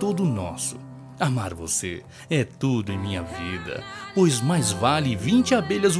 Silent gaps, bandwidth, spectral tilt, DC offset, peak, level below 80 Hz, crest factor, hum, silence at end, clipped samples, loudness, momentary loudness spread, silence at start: none; 11 kHz; -5 dB/octave; under 0.1%; -6 dBFS; -52 dBFS; 18 dB; none; 0 s; under 0.1%; -24 LUFS; 12 LU; 0 s